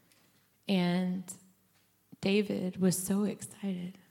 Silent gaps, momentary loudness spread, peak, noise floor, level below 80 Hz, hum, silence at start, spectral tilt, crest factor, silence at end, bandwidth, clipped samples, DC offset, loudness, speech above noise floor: none; 12 LU; -16 dBFS; -70 dBFS; -74 dBFS; none; 0.65 s; -5.5 dB/octave; 18 dB; 0.2 s; 16.5 kHz; under 0.1%; under 0.1%; -32 LUFS; 38 dB